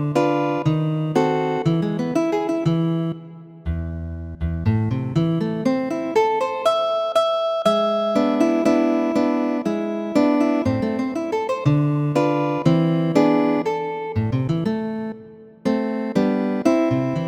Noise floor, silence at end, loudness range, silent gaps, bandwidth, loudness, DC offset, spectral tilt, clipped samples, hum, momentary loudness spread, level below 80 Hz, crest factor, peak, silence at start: -42 dBFS; 0 s; 4 LU; none; 12.5 kHz; -21 LUFS; under 0.1%; -7.5 dB/octave; under 0.1%; none; 9 LU; -42 dBFS; 18 dB; -4 dBFS; 0 s